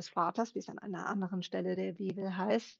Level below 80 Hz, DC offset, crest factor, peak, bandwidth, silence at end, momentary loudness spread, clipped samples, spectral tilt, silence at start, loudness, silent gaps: -82 dBFS; under 0.1%; 18 dB; -18 dBFS; 7.6 kHz; 0.05 s; 6 LU; under 0.1%; -6 dB/octave; 0 s; -37 LUFS; none